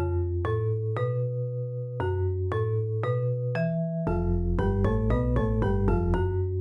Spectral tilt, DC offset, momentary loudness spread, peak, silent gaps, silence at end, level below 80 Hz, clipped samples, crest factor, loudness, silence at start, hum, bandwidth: -10 dB/octave; under 0.1%; 4 LU; -12 dBFS; none; 0 s; -34 dBFS; under 0.1%; 14 dB; -28 LUFS; 0 s; none; 5.4 kHz